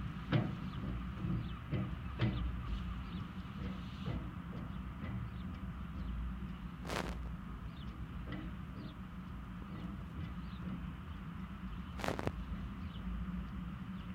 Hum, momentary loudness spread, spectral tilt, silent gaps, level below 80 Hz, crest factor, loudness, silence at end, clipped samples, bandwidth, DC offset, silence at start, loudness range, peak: none; 9 LU; -7 dB/octave; none; -48 dBFS; 24 dB; -43 LUFS; 0 s; under 0.1%; 16 kHz; under 0.1%; 0 s; 5 LU; -18 dBFS